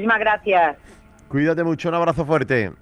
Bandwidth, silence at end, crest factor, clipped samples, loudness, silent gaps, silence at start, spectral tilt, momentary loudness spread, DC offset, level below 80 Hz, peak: 11 kHz; 0.1 s; 14 dB; under 0.1%; -20 LUFS; none; 0 s; -7 dB/octave; 4 LU; under 0.1%; -48 dBFS; -6 dBFS